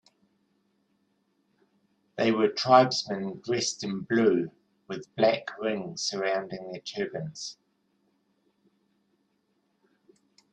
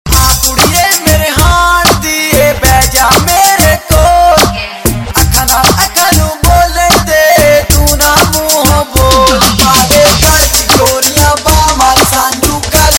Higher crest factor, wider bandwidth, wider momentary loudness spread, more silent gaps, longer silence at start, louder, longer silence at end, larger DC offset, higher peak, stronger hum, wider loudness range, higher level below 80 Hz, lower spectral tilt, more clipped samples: first, 24 dB vs 6 dB; second, 10 kHz vs over 20 kHz; first, 18 LU vs 3 LU; neither; first, 2.15 s vs 0.05 s; second, -27 LUFS vs -6 LUFS; first, 3 s vs 0 s; neither; second, -6 dBFS vs 0 dBFS; neither; first, 14 LU vs 1 LU; second, -74 dBFS vs -16 dBFS; about the same, -4 dB/octave vs -3 dB/octave; second, under 0.1% vs 1%